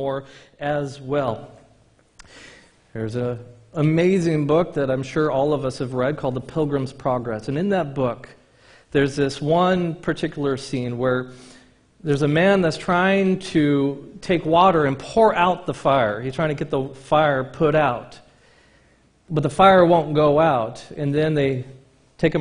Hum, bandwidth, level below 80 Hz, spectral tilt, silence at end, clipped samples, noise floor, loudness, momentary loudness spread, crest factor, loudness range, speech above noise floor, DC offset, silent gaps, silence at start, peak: none; 10.5 kHz; -50 dBFS; -7 dB/octave; 0 s; under 0.1%; -57 dBFS; -21 LUFS; 11 LU; 20 dB; 6 LU; 37 dB; under 0.1%; none; 0 s; -2 dBFS